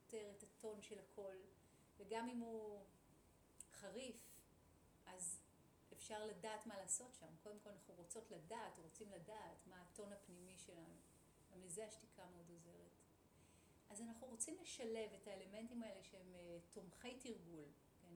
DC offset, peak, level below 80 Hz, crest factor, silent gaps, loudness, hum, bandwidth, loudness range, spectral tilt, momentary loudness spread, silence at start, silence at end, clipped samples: under 0.1%; -32 dBFS; -82 dBFS; 24 dB; none; -55 LUFS; none; over 20 kHz; 7 LU; -3 dB/octave; 15 LU; 0 s; 0 s; under 0.1%